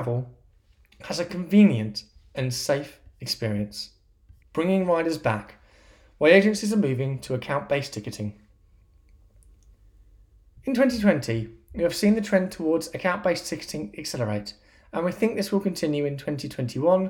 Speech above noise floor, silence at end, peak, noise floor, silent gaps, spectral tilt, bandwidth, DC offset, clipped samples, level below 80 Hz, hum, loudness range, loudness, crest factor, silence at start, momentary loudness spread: 34 dB; 0 s; -4 dBFS; -58 dBFS; none; -6 dB/octave; 17 kHz; under 0.1%; under 0.1%; -54 dBFS; none; 6 LU; -25 LUFS; 22 dB; 0 s; 15 LU